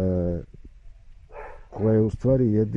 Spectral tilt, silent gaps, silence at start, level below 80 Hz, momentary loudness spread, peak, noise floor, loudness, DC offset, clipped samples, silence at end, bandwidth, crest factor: -11 dB/octave; none; 0 s; -42 dBFS; 21 LU; -10 dBFS; -45 dBFS; -23 LUFS; under 0.1%; under 0.1%; 0 s; 6.2 kHz; 14 dB